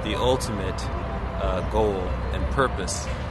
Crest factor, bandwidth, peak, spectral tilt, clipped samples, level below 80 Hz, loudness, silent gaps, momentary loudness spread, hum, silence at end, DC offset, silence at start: 18 dB; 12 kHz; -6 dBFS; -5 dB/octave; under 0.1%; -30 dBFS; -26 LUFS; none; 6 LU; none; 0 s; 0.1%; 0 s